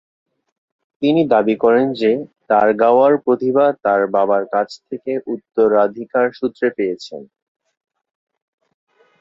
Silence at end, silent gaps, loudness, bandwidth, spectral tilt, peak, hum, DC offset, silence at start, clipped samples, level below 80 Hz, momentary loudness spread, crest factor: 1.95 s; none; -16 LUFS; 7.6 kHz; -7 dB/octave; -2 dBFS; none; under 0.1%; 1 s; under 0.1%; -62 dBFS; 11 LU; 16 dB